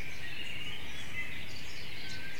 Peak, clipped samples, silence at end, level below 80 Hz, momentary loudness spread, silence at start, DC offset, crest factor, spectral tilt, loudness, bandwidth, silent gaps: -24 dBFS; under 0.1%; 0 s; -58 dBFS; 3 LU; 0 s; 3%; 14 dB; -3 dB/octave; -41 LUFS; 16.5 kHz; none